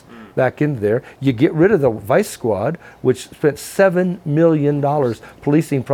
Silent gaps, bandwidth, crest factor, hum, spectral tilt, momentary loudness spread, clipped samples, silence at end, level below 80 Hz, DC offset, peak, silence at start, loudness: none; 17 kHz; 14 dB; none; -7 dB/octave; 7 LU; under 0.1%; 0 s; -52 dBFS; under 0.1%; -2 dBFS; 0.1 s; -18 LUFS